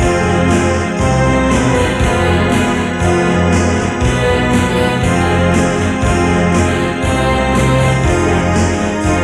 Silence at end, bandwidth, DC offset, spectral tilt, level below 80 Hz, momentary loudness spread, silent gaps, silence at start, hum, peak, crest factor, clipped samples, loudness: 0 s; 13 kHz; under 0.1%; -5.5 dB/octave; -24 dBFS; 2 LU; none; 0 s; none; -2 dBFS; 10 dB; under 0.1%; -13 LUFS